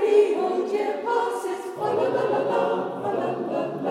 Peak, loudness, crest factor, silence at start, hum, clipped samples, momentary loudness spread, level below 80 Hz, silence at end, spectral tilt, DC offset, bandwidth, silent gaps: -8 dBFS; -25 LUFS; 16 dB; 0 s; none; under 0.1%; 6 LU; -80 dBFS; 0 s; -6 dB/octave; under 0.1%; 13 kHz; none